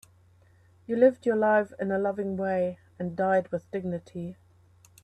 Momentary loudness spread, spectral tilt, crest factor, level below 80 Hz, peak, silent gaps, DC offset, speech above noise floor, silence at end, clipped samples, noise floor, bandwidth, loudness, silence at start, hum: 13 LU; -8 dB/octave; 20 dB; -68 dBFS; -8 dBFS; none; under 0.1%; 33 dB; 0.7 s; under 0.1%; -59 dBFS; 9.2 kHz; -27 LUFS; 0.9 s; none